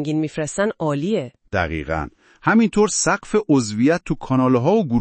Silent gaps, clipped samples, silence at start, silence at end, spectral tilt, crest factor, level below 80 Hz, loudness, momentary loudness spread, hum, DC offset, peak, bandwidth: none; under 0.1%; 0 s; 0 s; -5.5 dB/octave; 18 dB; -44 dBFS; -20 LUFS; 8 LU; none; under 0.1%; -2 dBFS; 8.8 kHz